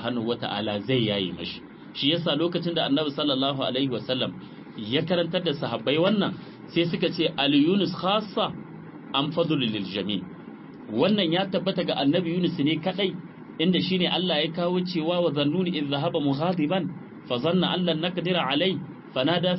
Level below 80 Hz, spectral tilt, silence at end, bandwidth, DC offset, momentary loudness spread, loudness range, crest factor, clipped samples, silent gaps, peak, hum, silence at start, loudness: -64 dBFS; -10 dB/octave; 0 s; 5.8 kHz; under 0.1%; 11 LU; 2 LU; 16 dB; under 0.1%; none; -8 dBFS; none; 0 s; -25 LUFS